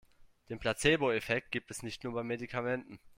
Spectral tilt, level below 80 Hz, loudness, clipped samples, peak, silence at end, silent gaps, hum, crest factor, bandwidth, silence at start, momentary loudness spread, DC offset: -4.5 dB/octave; -58 dBFS; -34 LUFS; under 0.1%; -14 dBFS; 0.05 s; none; none; 22 dB; 16 kHz; 0.2 s; 11 LU; under 0.1%